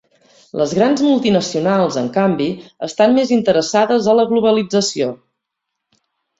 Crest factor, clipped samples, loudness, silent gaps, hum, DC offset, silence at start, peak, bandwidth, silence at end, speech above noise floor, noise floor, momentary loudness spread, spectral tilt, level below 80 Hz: 14 dB; under 0.1%; -15 LUFS; none; none; under 0.1%; 0.55 s; -2 dBFS; 8 kHz; 1.25 s; 63 dB; -78 dBFS; 9 LU; -5 dB/octave; -58 dBFS